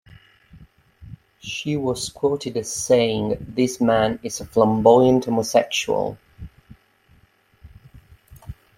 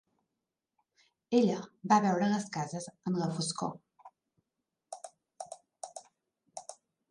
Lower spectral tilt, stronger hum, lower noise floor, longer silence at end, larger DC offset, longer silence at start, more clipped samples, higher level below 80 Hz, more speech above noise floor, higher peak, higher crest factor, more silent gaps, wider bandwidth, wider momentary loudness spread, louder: about the same, -5 dB/octave vs -5.5 dB/octave; neither; second, -58 dBFS vs -88 dBFS; second, 0.25 s vs 0.4 s; neither; second, 0.55 s vs 1.3 s; neither; first, -50 dBFS vs -80 dBFS; second, 38 dB vs 57 dB; first, -2 dBFS vs -12 dBFS; about the same, 20 dB vs 22 dB; neither; first, 16 kHz vs 11.5 kHz; second, 14 LU vs 22 LU; first, -20 LUFS vs -31 LUFS